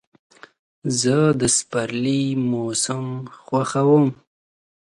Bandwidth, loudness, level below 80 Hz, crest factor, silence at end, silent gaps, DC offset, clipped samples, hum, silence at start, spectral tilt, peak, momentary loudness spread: 11.5 kHz; -20 LUFS; -58 dBFS; 16 dB; 0.8 s; none; under 0.1%; under 0.1%; none; 0.85 s; -5 dB/octave; -4 dBFS; 10 LU